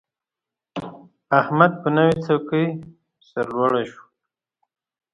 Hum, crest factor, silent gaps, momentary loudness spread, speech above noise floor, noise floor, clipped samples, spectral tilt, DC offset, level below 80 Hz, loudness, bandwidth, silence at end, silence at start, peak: none; 22 dB; none; 17 LU; 68 dB; -88 dBFS; under 0.1%; -8 dB/octave; under 0.1%; -60 dBFS; -20 LUFS; 10.5 kHz; 1.2 s; 0.75 s; 0 dBFS